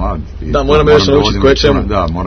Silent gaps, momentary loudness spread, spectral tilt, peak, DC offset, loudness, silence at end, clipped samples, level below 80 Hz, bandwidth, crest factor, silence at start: none; 10 LU; -6 dB/octave; 0 dBFS; under 0.1%; -11 LUFS; 0 s; 0.4%; -20 dBFS; 6.6 kHz; 10 dB; 0 s